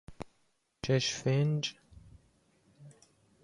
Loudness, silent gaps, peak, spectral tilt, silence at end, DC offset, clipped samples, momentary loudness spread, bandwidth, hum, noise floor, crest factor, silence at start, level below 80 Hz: -32 LUFS; none; -16 dBFS; -5 dB/octave; 0.5 s; under 0.1%; under 0.1%; 20 LU; 11 kHz; none; -75 dBFS; 18 dB; 0.1 s; -62 dBFS